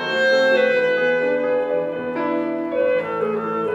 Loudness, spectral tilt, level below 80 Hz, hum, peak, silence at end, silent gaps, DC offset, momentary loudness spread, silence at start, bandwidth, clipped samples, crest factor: -20 LUFS; -5 dB/octave; -66 dBFS; none; -6 dBFS; 0 s; none; under 0.1%; 7 LU; 0 s; 7.8 kHz; under 0.1%; 12 dB